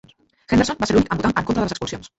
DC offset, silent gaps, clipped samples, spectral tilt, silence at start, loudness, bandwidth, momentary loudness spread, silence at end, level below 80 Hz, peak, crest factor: under 0.1%; none; under 0.1%; -5.5 dB/octave; 0.5 s; -20 LUFS; 8.2 kHz; 6 LU; 0.1 s; -40 dBFS; -4 dBFS; 16 dB